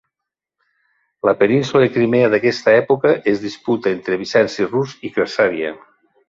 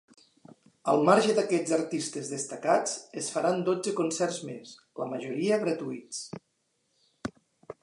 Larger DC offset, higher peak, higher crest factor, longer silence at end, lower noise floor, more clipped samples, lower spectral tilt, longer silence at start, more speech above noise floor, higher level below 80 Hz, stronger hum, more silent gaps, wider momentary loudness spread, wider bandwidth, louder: neither; first, -2 dBFS vs -8 dBFS; second, 16 dB vs 22 dB; first, 0.55 s vs 0.1 s; first, -83 dBFS vs -75 dBFS; neither; first, -6 dB/octave vs -4.5 dB/octave; first, 1.25 s vs 0.85 s; first, 67 dB vs 47 dB; first, -60 dBFS vs -72 dBFS; neither; neither; second, 8 LU vs 18 LU; second, 7.6 kHz vs 11.5 kHz; first, -17 LUFS vs -28 LUFS